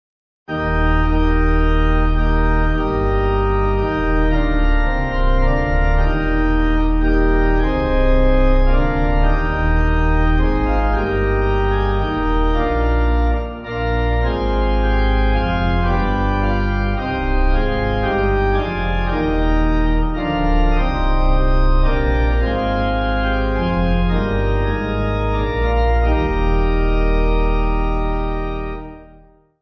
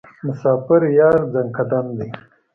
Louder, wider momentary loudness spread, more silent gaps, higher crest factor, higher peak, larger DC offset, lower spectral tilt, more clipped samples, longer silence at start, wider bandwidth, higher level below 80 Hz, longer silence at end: about the same, -19 LUFS vs -17 LUFS; second, 3 LU vs 15 LU; neither; about the same, 12 dB vs 16 dB; about the same, -4 dBFS vs -2 dBFS; neither; second, -8.5 dB/octave vs -10.5 dB/octave; neither; first, 0.5 s vs 0.25 s; about the same, 6 kHz vs 5.8 kHz; first, -18 dBFS vs -54 dBFS; first, 0.55 s vs 0.35 s